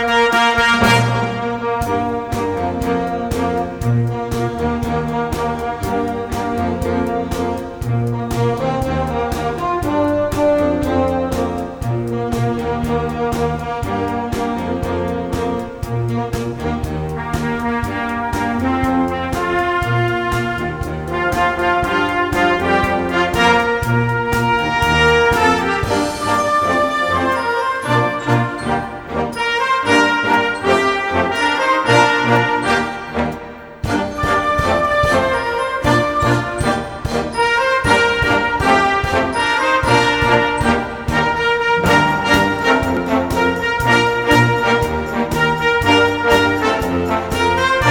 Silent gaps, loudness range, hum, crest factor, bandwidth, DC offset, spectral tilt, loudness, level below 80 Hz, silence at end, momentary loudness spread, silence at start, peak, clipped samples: none; 6 LU; none; 16 dB; over 20 kHz; under 0.1%; -5.5 dB/octave; -16 LUFS; -34 dBFS; 0 s; 8 LU; 0 s; 0 dBFS; under 0.1%